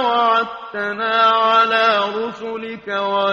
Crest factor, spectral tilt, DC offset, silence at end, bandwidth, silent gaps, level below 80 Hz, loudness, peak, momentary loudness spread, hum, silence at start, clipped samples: 14 dB; -4 dB/octave; under 0.1%; 0 s; 7.4 kHz; none; -64 dBFS; -17 LUFS; -4 dBFS; 12 LU; none; 0 s; under 0.1%